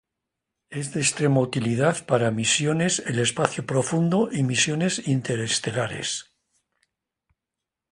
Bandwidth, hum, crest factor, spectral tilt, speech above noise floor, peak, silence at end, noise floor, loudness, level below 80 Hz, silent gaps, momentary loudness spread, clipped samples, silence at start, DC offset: 11.5 kHz; none; 24 dB; -4 dB/octave; 63 dB; 0 dBFS; 1.7 s; -86 dBFS; -23 LUFS; -60 dBFS; none; 7 LU; under 0.1%; 0.7 s; under 0.1%